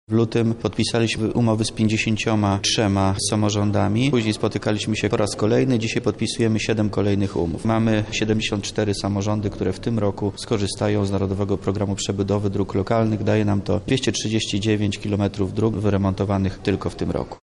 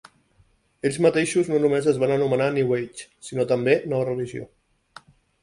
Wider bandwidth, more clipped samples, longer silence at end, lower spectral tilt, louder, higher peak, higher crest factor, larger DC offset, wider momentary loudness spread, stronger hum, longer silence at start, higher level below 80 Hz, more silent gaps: about the same, 11.5 kHz vs 11.5 kHz; neither; second, 0.05 s vs 0.95 s; about the same, -5.5 dB/octave vs -6 dB/octave; about the same, -22 LUFS vs -22 LUFS; second, -8 dBFS vs -4 dBFS; second, 12 dB vs 20 dB; neither; second, 4 LU vs 12 LU; neither; second, 0.1 s vs 0.85 s; first, -44 dBFS vs -60 dBFS; neither